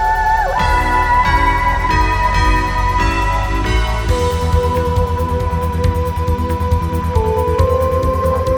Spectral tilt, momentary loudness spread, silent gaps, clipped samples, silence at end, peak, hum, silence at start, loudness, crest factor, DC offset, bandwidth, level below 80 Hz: -6 dB/octave; 4 LU; none; under 0.1%; 0 s; 0 dBFS; none; 0 s; -16 LUFS; 14 dB; 0.2%; 18.5 kHz; -20 dBFS